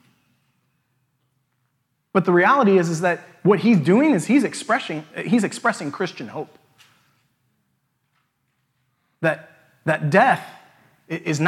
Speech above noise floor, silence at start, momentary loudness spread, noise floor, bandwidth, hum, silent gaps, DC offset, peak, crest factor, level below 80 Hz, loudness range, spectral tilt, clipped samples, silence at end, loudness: 52 dB; 2.15 s; 15 LU; -71 dBFS; 13 kHz; none; none; under 0.1%; -2 dBFS; 20 dB; -76 dBFS; 14 LU; -6 dB/octave; under 0.1%; 0 s; -20 LUFS